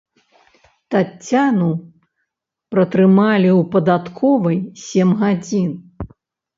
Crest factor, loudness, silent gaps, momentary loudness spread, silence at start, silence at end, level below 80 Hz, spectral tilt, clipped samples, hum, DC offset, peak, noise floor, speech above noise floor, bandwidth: 16 dB; -16 LUFS; none; 12 LU; 0.9 s; 0.5 s; -52 dBFS; -7.5 dB/octave; under 0.1%; none; under 0.1%; -2 dBFS; -77 dBFS; 62 dB; 7.6 kHz